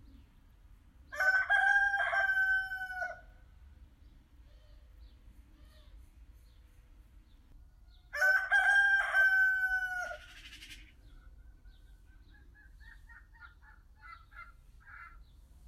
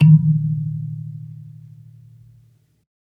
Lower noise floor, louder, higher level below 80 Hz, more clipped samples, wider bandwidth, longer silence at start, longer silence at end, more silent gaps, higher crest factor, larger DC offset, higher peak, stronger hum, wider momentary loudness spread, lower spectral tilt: first, -60 dBFS vs -55 dBFS; second, -29 LUFS vs -19 LUFS; about the same, -58 dBFS vs -62 dBFS; neither; first, 14.5 kHz vs 3 kHz; first, 1.1 s vs 0 s; second, 0.5 s vs 1.65 s; neither; about the same, 18 dB vs 18 dB; neither; second, -18 dBFS vs -2 dBFS; neither; about the same, 26 LU vs 27 LU; second, -1.5 dB/octave vs -11 dB/octave